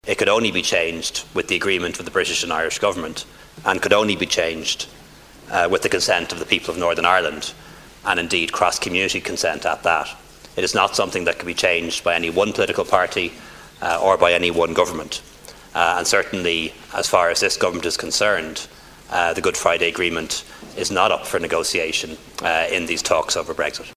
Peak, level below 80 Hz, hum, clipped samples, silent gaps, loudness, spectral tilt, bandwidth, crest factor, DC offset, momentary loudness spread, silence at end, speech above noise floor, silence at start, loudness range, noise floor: 0 dBFS; -48 dBFS; none; under 0.1%; none; -20 LUFS; -2 dB/octave; 16 kHz; 20 dB; under 0.1%; 10 LU; 0.05 s; 24 dB; 0.05 s; 2 LU; -44 dBFS